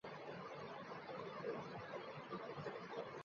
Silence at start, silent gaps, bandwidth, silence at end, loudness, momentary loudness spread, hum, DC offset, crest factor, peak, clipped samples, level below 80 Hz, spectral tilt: 0.05 s; none; 7.2 kHz; 0 s; -50 LUFS; 4 LU; none; under 0.1%; 16 dB; -34 dBFS; under 0.1%; -82 dBFS; -4 dB/octave